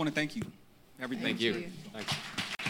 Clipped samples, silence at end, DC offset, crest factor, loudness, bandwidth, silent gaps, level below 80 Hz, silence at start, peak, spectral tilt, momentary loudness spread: under 0.1%; 0 s; under 0.1%; 20 dB; -35 LUFS; 17 kHz; none; -66 dBFS; 0 s; -14 dBFS; -4 dB/octave; 12 LU